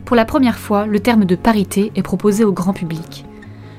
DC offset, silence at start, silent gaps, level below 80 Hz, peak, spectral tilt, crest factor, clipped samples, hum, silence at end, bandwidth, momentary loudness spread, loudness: under 0.1%; 0 s; none; -40 dBFS; 0 dBFS; -6.5 dB/octave; 16 dB; under 0.1%; none; 0 s; 16 kHz; 18 LU; -16 LUFS